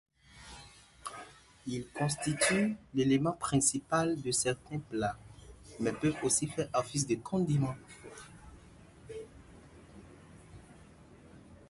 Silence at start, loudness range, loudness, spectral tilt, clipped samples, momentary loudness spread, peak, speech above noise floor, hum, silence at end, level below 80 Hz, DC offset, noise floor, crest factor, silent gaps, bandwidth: 0.35 s; 21 LU; -32 LUFS; -4.5 dB/octave; under 0.1%; 23 LU; -14 dBFS; 24 dB; none; 0.15 s; -60 dBFS; under 0.1%; -56 dBFS; 20 dB; none; 12 kHz